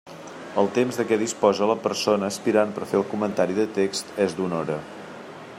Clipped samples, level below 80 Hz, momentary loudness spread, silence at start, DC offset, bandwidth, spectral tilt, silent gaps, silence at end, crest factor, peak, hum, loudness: under 0.1%; -68 dBFS; 17 LU; 0.05 s; under 0.1%; 16 kHz; -5 dB/octave; none; 0 s; 18 dB; -6 dBFS; none; -24 LUFS